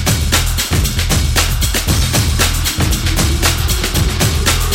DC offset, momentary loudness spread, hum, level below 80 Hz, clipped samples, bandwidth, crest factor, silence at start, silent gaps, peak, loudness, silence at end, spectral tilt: under 0.1%; 2 LU; none; -18 dBFS; under 0.1%; 18 kHz; 14 dB; 0 s; none; 0 dBFS; -14 LUFS; 0 s; -3.5 dB/octave